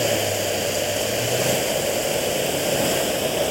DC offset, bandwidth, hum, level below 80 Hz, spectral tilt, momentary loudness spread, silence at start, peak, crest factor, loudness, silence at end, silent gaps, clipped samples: under 0.1%; 16.5 kHz; none; -50 dBFS; -2.5 dB/octave; 2 LU; 0 s; -8 dBFS; 14 dB; -21 LUFS; 0 s; none; under 0.1%